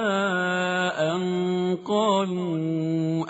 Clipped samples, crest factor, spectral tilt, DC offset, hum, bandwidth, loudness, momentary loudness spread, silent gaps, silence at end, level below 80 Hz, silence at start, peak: under 0.1%; 14 dB; -4.5 dB/octave; under 0.1%; none; 8 kHz; -25 LUFS; 4 LU; none; 0 s; -68 dBFS; 0 s; -10 dBFS